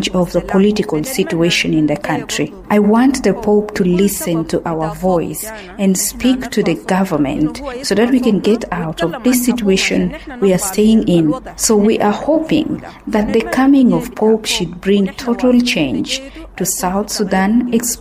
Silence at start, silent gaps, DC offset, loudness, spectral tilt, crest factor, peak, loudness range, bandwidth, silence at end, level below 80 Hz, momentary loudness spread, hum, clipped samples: 0 s; none; under 0.1%; -15 LUFS; -4.5 dB/octave; 14 dB; 0 dBFS; 2 LU; 16 kHz; 0 s; -38 dBFS; 7 LU; none; under 0.1%